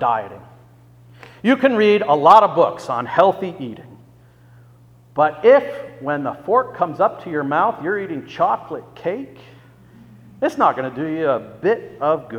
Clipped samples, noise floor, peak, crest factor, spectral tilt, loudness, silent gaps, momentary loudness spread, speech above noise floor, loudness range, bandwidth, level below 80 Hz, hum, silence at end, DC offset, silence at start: under 0.1%; -48 dBFS; 0 dBFS; 20 dB; -6.5 dB/octave; -18 LUFS; none; 16 LU; 30 dB; 7 LU; 12 kHz; -62 dBFS; 60 Hz at -50 dBFS; 0 s; under 0.1%; 0 s